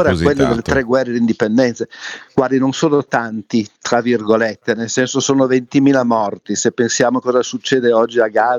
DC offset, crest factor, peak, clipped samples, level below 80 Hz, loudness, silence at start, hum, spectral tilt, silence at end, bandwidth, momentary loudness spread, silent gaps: under 0.1%; 14 dB; -2 dBFS; under 0.1%; -44 dBFS; -16 LUFS; 0 s; none; -4.5 dB/octave; 0 s; 9.8 kHz; 6 LU; none